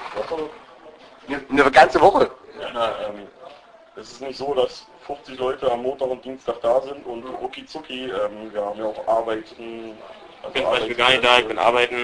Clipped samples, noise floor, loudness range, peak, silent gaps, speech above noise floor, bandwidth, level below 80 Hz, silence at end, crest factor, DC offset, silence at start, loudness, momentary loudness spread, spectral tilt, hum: under 0.1%; -45 dBFS; 8 LU; 0 dBFS; none; 24 dB; 10.5 kHz; -52 dBFS; 0 s; 22 dB; under 0.1%; 0 s; -20 LUFS; 21 LU; -3.5 dB/octave; none